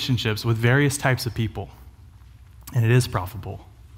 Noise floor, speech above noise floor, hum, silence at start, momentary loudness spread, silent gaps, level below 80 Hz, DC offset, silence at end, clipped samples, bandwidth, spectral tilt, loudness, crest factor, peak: -47 dBFS; 25 dB; none; 0 s; 17 LU; none; -46 dBFS; under 0.1%; 0 s; under 0.1%; 16.5 kHz; -5.5 dB/octave; -22 LUFS; 18 dB; -4 dBFS